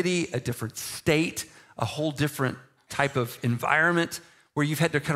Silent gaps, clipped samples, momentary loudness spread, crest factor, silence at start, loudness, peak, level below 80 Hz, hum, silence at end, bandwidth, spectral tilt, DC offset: none; under 0.1%; 12 LU; 22 dB; 0 s; -27 LUFS; -4 dBFS; -60 dBFS; none; 0 s; 16 kHz; -5 dB/octave; under 0.1%